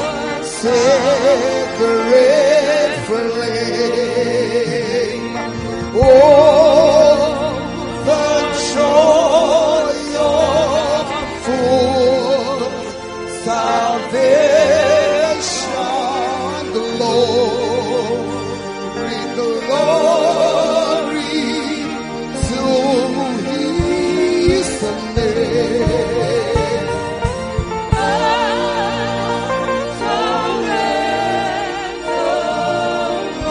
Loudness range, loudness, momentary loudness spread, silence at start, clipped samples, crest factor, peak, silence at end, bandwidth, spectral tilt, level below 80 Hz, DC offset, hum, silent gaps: 6 LU; -15 LUFS; 11 LU; 0 s; under 0.1%; 14 dB; 0 dBFS; 0 s; 11 kHz; -4.5 dB/octave; -36 dBFS; under 0.1%; none; none